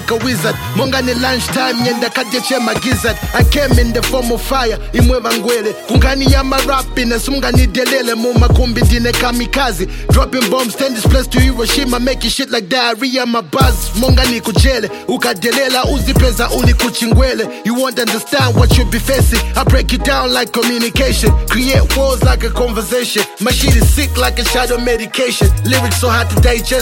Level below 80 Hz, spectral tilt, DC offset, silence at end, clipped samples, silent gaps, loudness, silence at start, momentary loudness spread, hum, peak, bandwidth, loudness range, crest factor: -18 dBFS; -4.5 dB/octave; under 0.1%; 0 s; under 0.1%; none; -13 LUFS; 0 s; 4 LU; none; 0 dBFS; 17 kHz; 1 LU; 12 dB